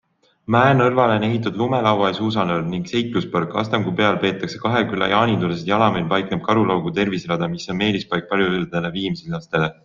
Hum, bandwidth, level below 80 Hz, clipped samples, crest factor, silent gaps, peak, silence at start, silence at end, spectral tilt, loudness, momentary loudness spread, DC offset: none; 7.4 kHz; -52 dBFS; under 0.1%; 18 dB; none; -2 dBFS; 0.5 s; 0.15 s; -6.5 dB/octave; -20 LUFS; 7 LU; under 0.1%